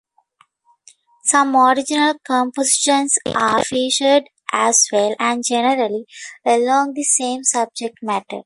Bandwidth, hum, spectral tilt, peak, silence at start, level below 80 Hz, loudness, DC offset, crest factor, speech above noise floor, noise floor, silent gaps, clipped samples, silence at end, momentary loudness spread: 11.5 kHz; none; -1.5 dB/octave; -2 dBFS; 1.25 s; -62 dBFS; -17 LUFS; under 0.1%; 16 dB; 41 dB; -58 dBFS; none; under 0.1%; 0.05 s; 10 LU